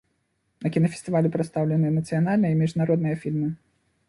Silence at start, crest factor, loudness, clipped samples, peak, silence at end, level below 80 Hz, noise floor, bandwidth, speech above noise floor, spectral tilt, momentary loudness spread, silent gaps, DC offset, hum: 0.6 s; 16 dB; -24 LUFS; under 0.1%; -8 dBFS; 0.55 s; -60 dBFS; -72 dBFS; 11.5 kHz; 49 dB; -8.5 dB/octave; 6 LU; none; under 0.1%; none